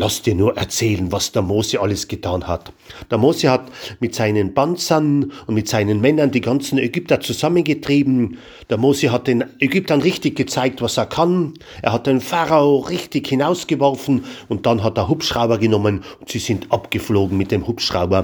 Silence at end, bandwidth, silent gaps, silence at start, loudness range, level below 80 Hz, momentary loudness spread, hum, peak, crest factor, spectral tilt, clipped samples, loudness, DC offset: 0 s; over 20 kHz; none; 0 s; 2 LU; -46 dBFS; 7 LU; none; 0 dBFS; 18 dB; -5.5 dB/octave; under 0.1%; -18 LUFS; under 0.1%